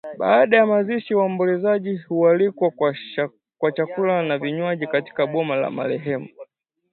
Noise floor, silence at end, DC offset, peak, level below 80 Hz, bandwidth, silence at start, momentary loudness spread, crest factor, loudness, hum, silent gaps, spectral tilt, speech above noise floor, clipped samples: -49 dBFS; 0.5 s; under 0.1%; -2 dBFS; -70 dBFS; 4.4 kHz; 0.05 s; 10 LU; 20 dB; -21 LUFS; none; none; -10.5 dB/octave; 29 dB; under 0.1%